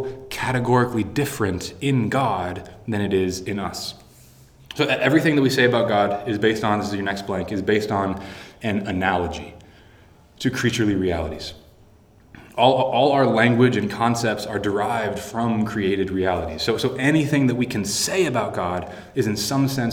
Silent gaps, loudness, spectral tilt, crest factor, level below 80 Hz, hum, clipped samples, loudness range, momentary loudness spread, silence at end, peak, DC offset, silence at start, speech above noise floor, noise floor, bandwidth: none; -21 LUFS; -5 dB/octave; 20 dB; -48 dBFS; none; under 0.1%; 5 LU; 12 LU; 0 s; -2 dBFS; under 0.1%; 0 s; 30 dB; -51 dBFS; over 20 kHz